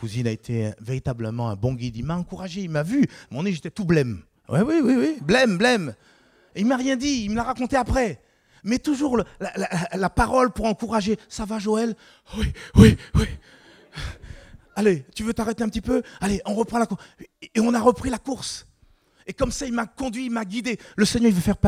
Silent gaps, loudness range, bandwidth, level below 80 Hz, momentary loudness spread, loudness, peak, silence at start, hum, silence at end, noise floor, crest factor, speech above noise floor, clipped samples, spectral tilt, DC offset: none; 5 LU; 15.5 kHz; -38 dBFS; 13 LU; -23 LUFS; 0 dBFS; 0 s; none; 0 s; -59 dBFS; 22 dB; 36 dB; under 0.1%; -6 dB/octave; under 0.1%